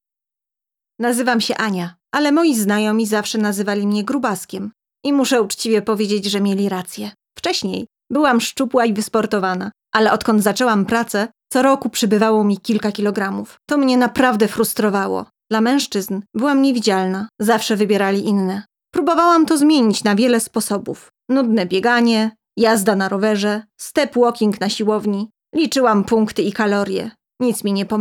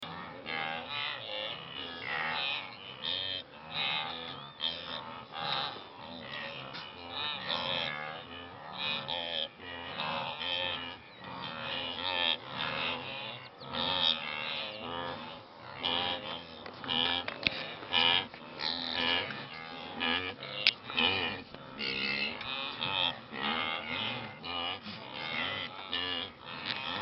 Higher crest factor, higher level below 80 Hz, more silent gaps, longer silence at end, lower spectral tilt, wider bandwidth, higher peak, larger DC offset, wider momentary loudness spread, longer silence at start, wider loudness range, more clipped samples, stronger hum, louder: second, 14 dB vs 32 dB; first, -60 dBFS vs -68 dBFS; neither; about the same, 0 s vs 0 s; first, -4.5 dB/octave vs 0.5 dB/octave; first, 19 kHz vs 6 kHz; about the same, -4 dBFS vs -4 dBFS; neither; second, 9 LU vs 13 LU; first, 1 s vs 0 s; about the same, 3 LU vs 5 LU; neither; neither; first, -17 LUFS vs -34 LUFS